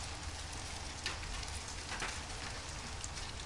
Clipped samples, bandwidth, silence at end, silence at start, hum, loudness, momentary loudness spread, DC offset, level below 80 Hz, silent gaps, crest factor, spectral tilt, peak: under 0.1%; 11.5 kHz; 0 s; 0 s; none; -42 LUFS; 3 LU; 0.1%; -50 dBFS; none; 20 dB; -2.5 dB/octave; -22 dBFS